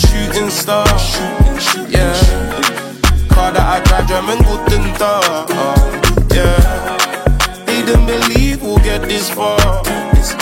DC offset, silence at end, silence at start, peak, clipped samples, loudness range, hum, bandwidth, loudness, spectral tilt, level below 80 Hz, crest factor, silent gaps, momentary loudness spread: under 0.1%; 0 s; 0 s; 0 dBFS; under 0.1%; 1 LU; none; 16.5 kHz; -13 LUFS; -4.5 dB/octave; -14 dBFS; 12 dB; none; 4 LU